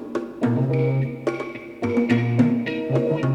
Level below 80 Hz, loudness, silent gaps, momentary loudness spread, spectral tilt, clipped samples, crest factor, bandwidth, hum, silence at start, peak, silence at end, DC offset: -58 dBFS; -22 LUFS; none; 9 LU; -8.5 dB/octave; under 0.1%; 16 dB; 8.6 kHz; none; 0 s; -6 dBFS; 0 s; under 0.1%